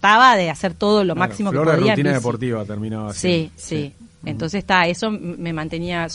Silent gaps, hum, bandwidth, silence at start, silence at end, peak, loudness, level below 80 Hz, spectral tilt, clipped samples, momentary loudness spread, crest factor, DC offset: none; none; 11.5 kHz; 0.05 s; 0 s; 0 dBFS; -19 LUFS; -48 dBFS; -5 dB/octave; under 0.1%; 11 LU; 18 dB; under 0.1%